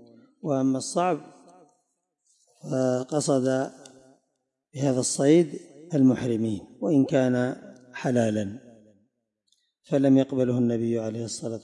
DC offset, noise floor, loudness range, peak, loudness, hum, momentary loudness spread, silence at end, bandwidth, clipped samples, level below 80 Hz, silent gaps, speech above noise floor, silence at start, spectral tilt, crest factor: under 0.1%; -79 dBFS; 5 LU; -8 dBFS; -25 LUFS; none; 13 LU; 0.05 s; 11.5 kHz; under 0.1%; -70 dBFS; none; 55 dB; 0.45 s; -6 dB/octave; 18 dB